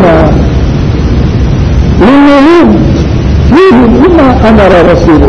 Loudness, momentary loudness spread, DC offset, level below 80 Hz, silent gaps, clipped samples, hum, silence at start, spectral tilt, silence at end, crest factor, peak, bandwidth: -4 LUFS; 6 LU; under 0.1%; -12 dBFS; none; 10%; none; 0 s; -8 dB/octave; 0 s; 4 dB; 0 dBFS; 8.4 kHz